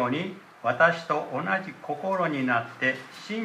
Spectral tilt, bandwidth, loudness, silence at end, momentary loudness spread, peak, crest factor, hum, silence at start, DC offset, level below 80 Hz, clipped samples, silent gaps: -6 dB/octave; 14 kHz; -27 LUFS; 0 s; 13 LU; -8 dBFS; 20 dB; none; 0 s; under 0.1%; -78 dBFS; under 0.1%; none